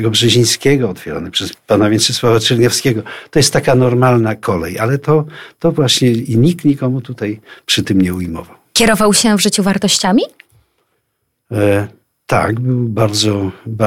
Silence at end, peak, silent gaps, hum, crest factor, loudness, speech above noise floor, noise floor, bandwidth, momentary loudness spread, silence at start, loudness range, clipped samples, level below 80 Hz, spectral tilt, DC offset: 0 s; 0 dBFS; none; none; 14 dB; -13 LUFS; 55 dB; -68 dBFS; 16.5 kHz; 11 LU; 0 s; 4 LU; under 0.1%; -42 dBFS; -4.5 dB/octave; under 0.1%